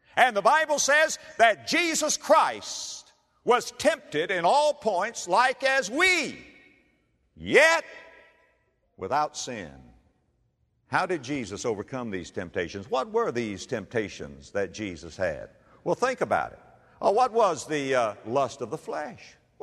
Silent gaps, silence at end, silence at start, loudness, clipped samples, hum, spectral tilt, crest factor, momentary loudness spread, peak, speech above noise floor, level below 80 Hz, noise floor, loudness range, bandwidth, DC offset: none; 0.35 s; 0.15 s; -25 LUFS; under 0.1%; none; -2.5 dB/octave; 22 dB; 15 LU; -4 dBFS; 45 dB; -62 dBFS; -70 dBFS; 8 LU; 13.5 kHz; under 0.1%